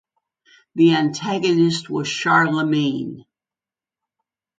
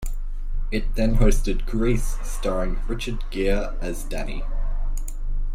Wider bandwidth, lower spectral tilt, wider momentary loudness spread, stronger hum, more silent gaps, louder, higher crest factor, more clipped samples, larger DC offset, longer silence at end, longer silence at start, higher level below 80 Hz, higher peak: second, 9.2 kHz vs 14.5 kHz; about the same, -5.5 dB/octave vs -6 dB/octave; about the same, 10 LU vs 12 LU; neither; neither; first, -19 LUFS vs -27 LUFS; about the same, 18 dB vs 16 dB; neither; neither; first, 1.4 s vs 0 s; first, 0.75 s vs 0 s; second, -66 dBFS vs -22 dBFS; about the same, -2 dBFS vs -4 dBFS